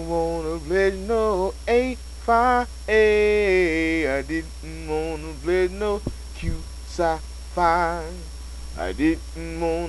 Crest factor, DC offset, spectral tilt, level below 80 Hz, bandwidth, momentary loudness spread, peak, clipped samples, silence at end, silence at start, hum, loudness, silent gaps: 18 dB; 0.2%; -5.5 dB/octave; -34 dBFS; 11 kHz; 15 LU; -6 dBFS; under 0.1%; 0 s; 0 s; none; -23 LUFS; none